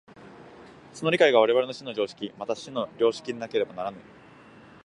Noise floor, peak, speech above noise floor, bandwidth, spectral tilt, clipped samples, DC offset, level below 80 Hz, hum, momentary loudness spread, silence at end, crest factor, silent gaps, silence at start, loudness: -51 dBFS; -6 dBFS; 25 dB; 11 kHz; -4.5 dB/octave; under 0.1%; under 0.1%; -70 dBFS; none; 15 LU; 0.85 s; 22 dB; none; 0.2 s; -26 LUFS